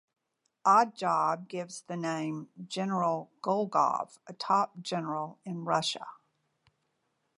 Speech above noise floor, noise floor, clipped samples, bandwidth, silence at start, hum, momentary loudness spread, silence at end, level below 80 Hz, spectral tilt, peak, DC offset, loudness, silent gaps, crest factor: 48 dB; -78 dBFS; under 0.1%; 11.5 kHz; 0.65 s; none; 14 LU; 1.25 s; -84 dBFS; -5 dB/octave; -12 dBFS; under 0.1%; -30 LUFS; none; 20 dB